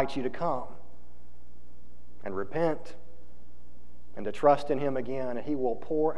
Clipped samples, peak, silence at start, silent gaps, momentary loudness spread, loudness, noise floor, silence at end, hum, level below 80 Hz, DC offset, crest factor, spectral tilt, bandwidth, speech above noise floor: under 0.1%; -8 dBFS; 0 s; none; 16 LU; -30 LUFS; -55 dBFS; 0 s; 60 Hz at -55 dBFS; -56 dBFS; 3%; 22 dB; -7.5 dB/octave; 11 kHz; 25 dB